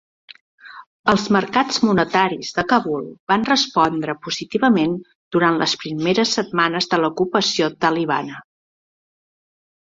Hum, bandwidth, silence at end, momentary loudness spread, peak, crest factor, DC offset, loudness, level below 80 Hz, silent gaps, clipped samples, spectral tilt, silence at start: none; 7.8 kHz; 1.4 s; 8 LU; -2 dBFS; 18 dB; under 0.1%; -19 LUFS; -56 dBFS; 0.87-1.04 s, 3.20-3.27 s, 5.15-5.31 s; under 0.1%; -4.5 dB/octave; 0.65 s